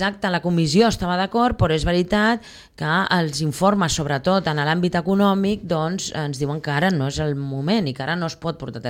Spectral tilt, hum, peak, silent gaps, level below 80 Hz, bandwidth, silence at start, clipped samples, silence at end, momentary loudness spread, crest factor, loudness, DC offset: -5.5 dB/octave; none; -4 dBFS; none; -40 dBFS; 16 kHz; 0 s; under 0.1%; 0 s; 7 LU; 16 dB; -21 LUFS; under 0.1%